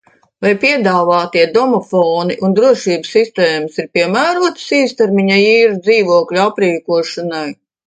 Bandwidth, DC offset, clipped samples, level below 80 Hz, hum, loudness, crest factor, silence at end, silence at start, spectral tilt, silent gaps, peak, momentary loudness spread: 9.4 kHz; under 0.1%; under 0.1%; -62 dBFS; none; -13 LUFS; 12 dB; 0.35 s; 0.4 s; -5 dB/octave; none; 0 dBFS; 7 LU